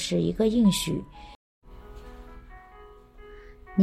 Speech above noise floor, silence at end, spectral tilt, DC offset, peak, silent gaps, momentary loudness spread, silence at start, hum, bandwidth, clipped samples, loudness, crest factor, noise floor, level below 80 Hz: 25 dB; 0 s; -5.5 dB/octave; under 0.1%; -12 dBFS; 1.35-1.62 s; 27 LU; 0 s; none; 15 kHz; under 0.1%; -25 LUFS; 18 dB; -50 dBFS; -48 dBFS